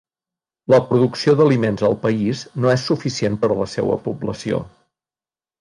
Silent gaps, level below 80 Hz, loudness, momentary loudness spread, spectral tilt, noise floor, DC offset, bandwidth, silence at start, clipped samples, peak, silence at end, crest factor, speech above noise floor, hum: none; -52 dBFS; -19 LUFS; 10 LU; -6.5 dB/octave; under -90 dBFS; under 0.1%; 11 kHz; 0.7 s; under 0.1%; -2 dBFS; 0.9 s; 16 dB; over 72 dB; none